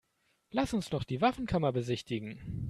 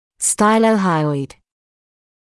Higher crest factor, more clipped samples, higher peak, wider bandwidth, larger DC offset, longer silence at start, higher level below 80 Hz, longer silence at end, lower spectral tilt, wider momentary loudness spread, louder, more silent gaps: first, 20 dB vs 14 dB; neither; second, -14 dBFS vs -4 dBFS; first, 13.5 kHz vs 12 kHz; neither; first, 0.55 s vs 0.2 s; about the same, -54 dBFS vs -58 dBFS; second, 0 s vs 1.1 s; first, -6.5 dB/octave vs -4.5 dB/octave; second, 8 LU vs 11 LU; second, -33 LUFS vs -16 LUFS; neither